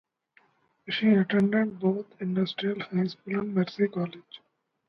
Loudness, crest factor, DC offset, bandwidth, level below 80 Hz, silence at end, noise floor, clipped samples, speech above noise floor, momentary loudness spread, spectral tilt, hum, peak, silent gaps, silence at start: -27 LUFS; 18 dB; under 0.1%; 6 kHz; -72 dBFS; 0.5 s; -65 dBFS; under 0.1%; 39 dB; 11 LU; -8.5 dB/octave; none; -10 dBFS; none; 0.85 s